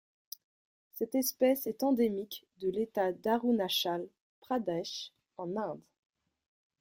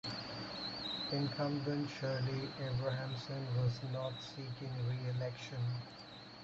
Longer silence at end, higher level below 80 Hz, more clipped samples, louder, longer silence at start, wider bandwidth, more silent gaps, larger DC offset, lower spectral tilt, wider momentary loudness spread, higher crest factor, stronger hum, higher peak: first, 1 s vs 0 s; second, -76 dBFS vs -66 dBFS; neither; first, -33 LUFS vs -40 LUFS; first, 0.95 s vs 0.05 s; first, 16.5 kHz vs 7.8 kHz; first, 4.20-4.42 s vs none; neither; second, -4 dB/octave vs -6.5 dB/octave; first, 19 LU vs 8 LU; about the same, 18 dB vs 16 dB; neither; first, -16 dBFS vs -24 dBFS